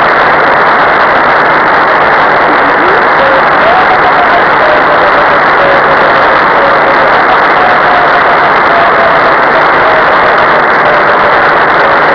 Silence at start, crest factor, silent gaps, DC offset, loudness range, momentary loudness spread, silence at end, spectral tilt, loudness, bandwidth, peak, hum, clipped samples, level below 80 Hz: 0 s; 6 dB; none; under 0.1%; 0 LU; 0 LU; 0 s; -5.5 dB/octave; -5 LUFS; 5.4 kHz; 0 dBFS; none; under 0.1%; -36 dBFS